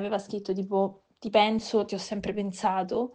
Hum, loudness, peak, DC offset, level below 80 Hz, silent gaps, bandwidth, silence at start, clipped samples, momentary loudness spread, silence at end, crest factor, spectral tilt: none; -28 LUFS; -8 dBFS; under 0.1%; -60 dBFS; none; 9.4 kHz; 0 s; under 0.1%; 9 LU; 0 s; 20 dB; -5 dB/octave